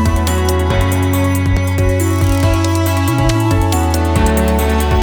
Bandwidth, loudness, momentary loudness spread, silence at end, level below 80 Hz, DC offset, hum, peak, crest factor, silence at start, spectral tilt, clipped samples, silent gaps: over 20 kHz; -14 LUFS; 1 LU; 0 s; -20 dBFS; under 0.1%; none; -2 dBFS; 12 dB; 0 s; -6 dB/octave; under 0.1%; none